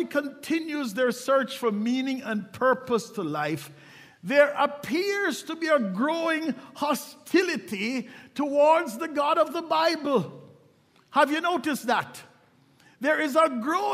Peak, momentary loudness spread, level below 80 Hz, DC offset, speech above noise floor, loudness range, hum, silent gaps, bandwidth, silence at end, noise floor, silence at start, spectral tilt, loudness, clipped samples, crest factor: -6 dBFS; 9 LU; -78 dBFS; under 0.1%; 35 dB; 2 LU; none; none; 16 kHz; 0 s; -60 dBFS; 0 s; -4.5 dB/octave; -26 LUFS; under 0.1%; 20 dB